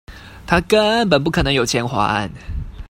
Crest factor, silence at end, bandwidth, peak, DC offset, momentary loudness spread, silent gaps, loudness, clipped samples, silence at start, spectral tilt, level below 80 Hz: 18 dB; 0.05 s; 16.5 kHz; 0 dBFS; under 0.1%; 15 LU; none; -17 LUFS; under 0.1%; 0.1 s; -4.5 dB/octave; -34 dBFS